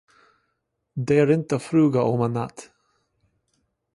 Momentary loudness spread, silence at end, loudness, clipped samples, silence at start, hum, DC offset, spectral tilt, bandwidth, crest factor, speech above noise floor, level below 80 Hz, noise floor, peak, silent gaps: 13 LU; 1.3 s; -22 LUFS; under 0.1%; 0.95 s; none; under 0.1%; -8 dB/octave; 11.5 kHz; 18 dB; 55 dB; -62 dBFS; -76 dBFS; -6 dBFS; none